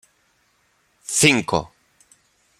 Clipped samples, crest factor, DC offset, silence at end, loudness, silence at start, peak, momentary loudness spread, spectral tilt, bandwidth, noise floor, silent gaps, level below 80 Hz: under 0.1%; 24 dB; under 0.1%; 0.95 s; -18 LUFS; 1.1 s; -2 dBFS; 24 LU; -3 dB/octave; 16.5 kHz; -64 dBFS; none; -54 dBFS